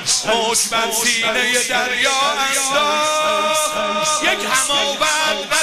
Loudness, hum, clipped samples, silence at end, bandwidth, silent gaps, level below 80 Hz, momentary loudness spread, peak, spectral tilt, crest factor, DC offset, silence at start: -16 LUFS; none; under 0.1%; 0 s; 15.5 kHz; none; -52 dBFS; 2 LU; -4 dBFS; 0 dB/octave; 14 dB; under 0.1%; 0 s